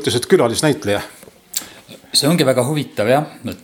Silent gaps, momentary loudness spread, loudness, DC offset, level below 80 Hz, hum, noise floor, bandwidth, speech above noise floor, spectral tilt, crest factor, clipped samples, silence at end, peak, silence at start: none; 12 LU; -17 LUFS; under 0.1%; -56 dBFS; none; -40 dBFS; over 20 kHz; 24 dB; -4.5 dB/octave; 18 dB; under 0.1%; 0.1 s; 0 dBFS; 0 s